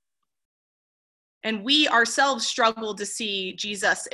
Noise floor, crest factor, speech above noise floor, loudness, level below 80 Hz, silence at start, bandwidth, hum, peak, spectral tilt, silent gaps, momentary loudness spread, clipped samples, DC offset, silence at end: under -90 dBFS; 20 dB; over 66 dB; -23 LUFS; -70 dBFS; 1.45 s; 13 kHz; none; -6 dBFS; -1.5 dB/octave; none; 11 LU; under 0.1%; under 0.1%; 0.05 s